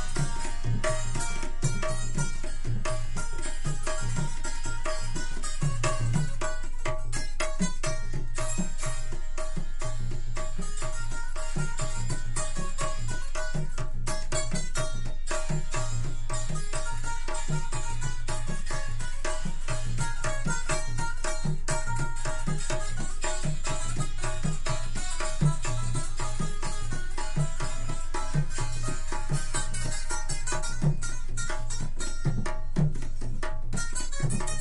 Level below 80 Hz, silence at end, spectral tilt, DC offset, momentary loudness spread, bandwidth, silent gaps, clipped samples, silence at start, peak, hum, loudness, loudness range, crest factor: -28 dBFS; 0 s; -4.5 dB/octave; under 0.1%; 6 LU; 11.5 kHz; none; under 0.1%; 0 s; -12 dBFS; none; -33 LUFS; 3 LU; 14 dB